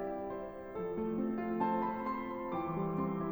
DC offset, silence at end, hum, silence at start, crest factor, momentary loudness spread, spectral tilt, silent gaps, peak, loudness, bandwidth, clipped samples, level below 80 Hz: under 0.1%; 0 s; none; 0 s; 16 dB; 8 LU; -10 dB/octave; none; -22 dBFS; -37 LUFS; over 20 kHz; under 0.1%; -60 dBFS